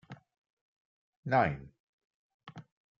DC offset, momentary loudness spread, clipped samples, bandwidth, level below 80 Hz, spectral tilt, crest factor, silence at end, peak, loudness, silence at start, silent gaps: under 0.1%; 25 LU; under 0.1%; 7.2 kHz; -64 dBFS; -5.5 dB/octave; 22 dB; 0.4 s; -16 dBFS; -30 LUFS; 0.1 s; 0.38-1.23 s, 1.80-2.40 s